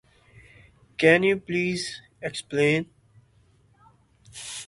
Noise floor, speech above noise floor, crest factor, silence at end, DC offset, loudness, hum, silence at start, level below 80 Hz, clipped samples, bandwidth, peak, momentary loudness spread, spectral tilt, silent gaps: -60 dBFS; 37 dB; 24 dB; 0.05 s; under 0.1%; -24 LUFS; none; 1 s; -62 dBFS; under 0.1%; 11.5 kHz; -4 dBFS; 22 LU; -5 dB/octave; none